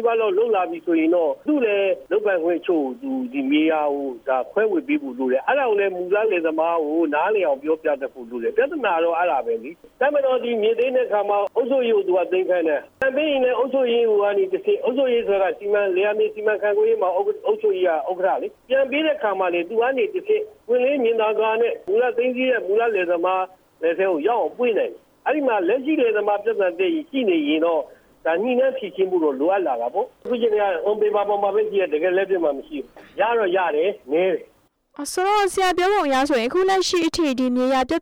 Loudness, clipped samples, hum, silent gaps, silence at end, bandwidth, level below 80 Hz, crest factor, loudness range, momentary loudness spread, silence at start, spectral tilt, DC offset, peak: -21 LUFS; under 0.1%; none; none; 0 s; over 20 kHz; -60 dBFS; 14 dB; 2 LU; 5 LU; 0 s; -4 dB/octave; under 0.1%; -6 dBFS